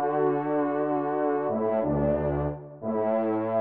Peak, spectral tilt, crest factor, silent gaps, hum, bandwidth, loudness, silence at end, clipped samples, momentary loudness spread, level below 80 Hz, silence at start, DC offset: -14 dBFS; -9 dB/octave; 12 dB; none; none; 3.9 kHz; -27 LUFS; 0 s; under 0.1%; 5 LU; -48 dBFS; 0 s; 0.1%